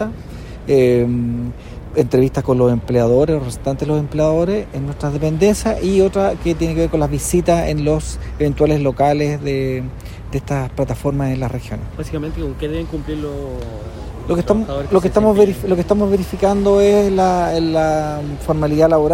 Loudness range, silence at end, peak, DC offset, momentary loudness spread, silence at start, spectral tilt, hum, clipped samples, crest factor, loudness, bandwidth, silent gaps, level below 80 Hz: 8 LU; 0 s; 0 dBFS; under 0.1%; 13 LU; 0 s; -7 dB/octave; none; under 0.1%; 16 dB; -17 LUFS; 16 kHz; none; -32 dBFS